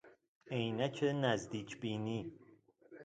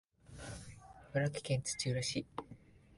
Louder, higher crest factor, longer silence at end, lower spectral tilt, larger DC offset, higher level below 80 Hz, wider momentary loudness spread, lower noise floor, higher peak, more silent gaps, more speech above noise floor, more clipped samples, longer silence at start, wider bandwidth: about the same, -38 LUFS vs -39 LUFS; about the same, 22 dB vs 18 dB; about the same, 0 s vs 0 s; first, -6 dB/octave vs -4.5 dB/octave; neither; second, -72 dBFS vs -62 dBFS; second, 9 LU vs 21 LU; first, -64 dBFS vs -59 dBFS; first, -18 dBFS vs -22 dBFS; first, 0.28-0.41 s vs none; first, 26 dB vs 22 dB; neither; second, 0.05 s vs 0.3 s; second, 9 kHz vs 11.5 kHz